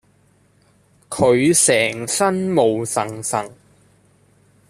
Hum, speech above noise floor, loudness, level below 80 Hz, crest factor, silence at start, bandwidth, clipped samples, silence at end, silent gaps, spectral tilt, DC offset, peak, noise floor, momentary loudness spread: none; 39 dB; -17 LUFS; -58 dBFS; 18 dB; 1.1 s; 14.5 kHz; under 0.1%; 1.2 s; none; -3.5 dB/octave; under 0.1%; -2 dBFS; -57 dBFS; 11 LU